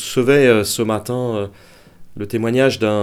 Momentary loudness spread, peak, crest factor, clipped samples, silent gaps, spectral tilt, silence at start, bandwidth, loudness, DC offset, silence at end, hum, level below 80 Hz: 13 LU; 0 dBFS; 16 dB; under 0.1%; none; -5 dB/octave; 0 s; 16 kHz; -17 LUFS; 0.1%; 0 s; none; -52 dBFS